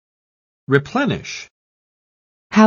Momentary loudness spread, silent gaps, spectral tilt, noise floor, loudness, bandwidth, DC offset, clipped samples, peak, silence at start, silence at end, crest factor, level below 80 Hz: 21 LU; 1.51-2.50 s; -6 dB/octave; under -90 dBFS; -20 LUFS; 7.2 kHz; under 0.1%; under 0.1%; 0 dBFS; 0.7 s; 0 s; 20 dB; -54 dBFS